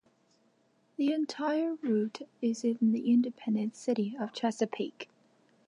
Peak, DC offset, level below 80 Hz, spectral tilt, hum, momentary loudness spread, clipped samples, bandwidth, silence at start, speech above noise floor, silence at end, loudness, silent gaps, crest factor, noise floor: -16 dBFS; under 0.1%; -88 dBFS; -6 dB/octave; none; 10 LU; under 0.1%; 10.5 kHz; 1 s; 39 dB; 0.65 s; -31 LUFS; none; 16 dB; -70 dBFS